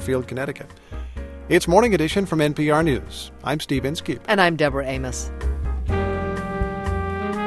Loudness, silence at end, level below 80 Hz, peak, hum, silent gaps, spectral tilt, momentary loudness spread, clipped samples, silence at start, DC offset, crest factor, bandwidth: -22 LUFS; 0 s; -32 dBFS; -2 dBFS; none; none; -5.5 dB/octave; 17 LU; under 0.1%; 0 s; under 0.1%; 20 dB; 13 kHz